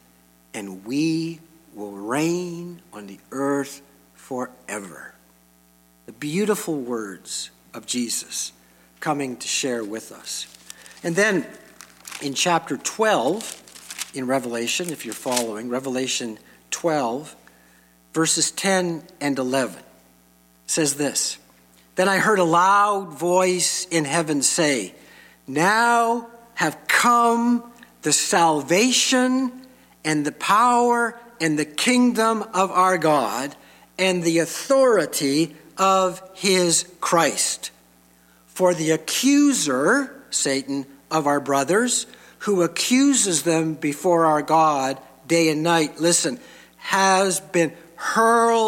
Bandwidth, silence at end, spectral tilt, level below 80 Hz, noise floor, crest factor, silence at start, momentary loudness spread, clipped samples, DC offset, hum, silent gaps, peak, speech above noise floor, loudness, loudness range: 17 kHz; 0 s; -3 dB/octave; -68 dBFS; -56 dBFS; 18 dB; 0.55 s; 16 LU; under 0.1%; under 0.1%; 60 Hz at -60 dBFS; none; -4 dBFS; 35 dB; -21 LUFS; 8 LU